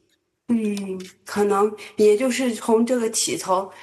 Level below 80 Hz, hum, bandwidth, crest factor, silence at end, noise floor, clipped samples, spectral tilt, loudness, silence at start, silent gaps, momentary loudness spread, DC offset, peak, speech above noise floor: -72 dBFS; none; 12.5 kHz; 14 dB; 0 s; -46 dBFS; under 0.1%; -4 dB/octave; -21 LUFS; 0.5 s; none; 11 LU; under 0.1%; -8 dBFS; 25 dB